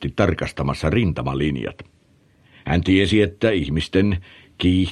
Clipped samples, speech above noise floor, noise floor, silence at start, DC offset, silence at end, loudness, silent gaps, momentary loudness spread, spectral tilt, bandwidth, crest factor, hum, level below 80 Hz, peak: under 0.1%; 37 dB; -56 dBFS; 0 s; under 0.1%; 0 s; -20 LUFS; none; 8 LU; -7 dB/octave; 11 kHz; 18 dB; none; -36 dBFS; -2 dBFS